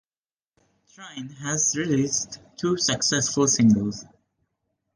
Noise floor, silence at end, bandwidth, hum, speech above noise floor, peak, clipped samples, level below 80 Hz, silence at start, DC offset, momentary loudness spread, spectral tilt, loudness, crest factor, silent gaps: under -90 dBFS; 0.95 s; 10.5 kHz; none; over 66 dB; -8 dBFS; under 0.1%; -58 dBFS; 1 s; under 0.1%; 18 LU; -3.5 dB/octave; -22 LUFS; 18 dB; none